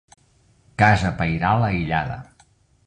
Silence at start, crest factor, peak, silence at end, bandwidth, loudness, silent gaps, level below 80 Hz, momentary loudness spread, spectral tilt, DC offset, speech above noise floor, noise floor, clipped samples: 0.8 s; 20 dB; -2 dBFS; 0.65 s; 9.6 kHz; -20 LUFS; none; -40 dBFS; 15 LU; -7 dB/octave; under 0.1%; 39 dB; -58 dBFS; under 0.1%